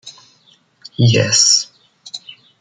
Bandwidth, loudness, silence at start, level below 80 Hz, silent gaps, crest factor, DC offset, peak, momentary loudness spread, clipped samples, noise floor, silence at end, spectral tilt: 10.5 kHz; -12 LUFS; 0.05 s; -56 dBFS; none; 16 dB; under 0.1%; -2 dBFS; 22 LU; under 0.1%; -54 dBFS; 0.3 s; -3 dB/octave